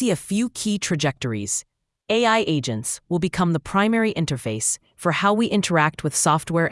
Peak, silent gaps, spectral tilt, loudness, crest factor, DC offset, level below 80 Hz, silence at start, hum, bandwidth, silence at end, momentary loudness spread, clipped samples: -4 dBFS; none; -4 dB/octave; -22 LUFS; 18 dB; under 0.1%; -54 dBFS; 0 s; none; 12 kHz; 0 s; 6 LU; under 0.1%